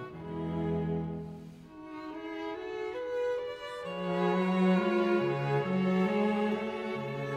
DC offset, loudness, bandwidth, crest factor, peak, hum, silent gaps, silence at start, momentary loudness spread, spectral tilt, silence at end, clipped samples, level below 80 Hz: under 0.1%; -32 LUFS; 8.8 kHz; 14 dB; -18 dBFS; none; none; 0 s; 14 LU; -8 dB/octave; 0 s; under 0.1%; -60 dBFS